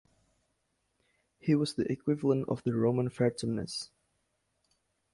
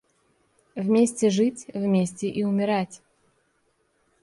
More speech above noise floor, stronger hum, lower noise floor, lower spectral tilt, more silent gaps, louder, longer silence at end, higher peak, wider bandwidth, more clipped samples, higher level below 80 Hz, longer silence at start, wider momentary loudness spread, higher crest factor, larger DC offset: about the same, 48 dB vs 46 dB; neither; first, -78 dBFS vs -69 dBFS; about the same, -6.5 dB/octave vs -6 dB/octave; neither; second, -31 LUFS vs -24 LUFS; about the same, 1.3 s vs 1.25 s; second, -14 dBFS vs -10 dBFS; about the same, 11.5 kHz vs 11.5 kHz; neither; about the same, -66 dBFS vs -68 dBFS; first, 1.45 s vs 0.75 s; about the same, 9 LU vs 9 LU; about the same, 18 dB vs 16 dB; neither